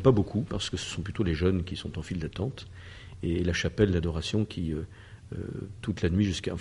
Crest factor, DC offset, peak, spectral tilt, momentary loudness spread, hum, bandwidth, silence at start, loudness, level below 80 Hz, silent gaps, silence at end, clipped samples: 20 dB; under 0.1%; -8 dBFS; -6 dB/octave; 15 LU; none; 11.5 kHz; 0 s; -30 LUFS; -44 dBFS; none; 0 s; under 0.1%